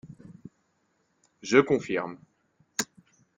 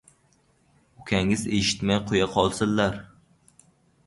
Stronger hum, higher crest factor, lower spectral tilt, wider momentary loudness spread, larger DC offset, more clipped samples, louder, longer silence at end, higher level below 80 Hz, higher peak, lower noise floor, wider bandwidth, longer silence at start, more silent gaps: neither; about the same, 24 dB vs 22 dB; about the same, -4 dB/octave vs -4.5 dB/octave; first, 26 LU vs 4 LU; neither; neither; second, -27 LUFS vs -24 LUFS; second, 0.55 s vs 1 s; second, -68 dBFS vs -48 dBFS; about the same, -6 dBFS vs -6 dBFS; first, -72 dBFS vs -64 dBFS; about the same, 11.5 kHz vs 11.5 kHz; second, 0.05 s vs 1 s; neither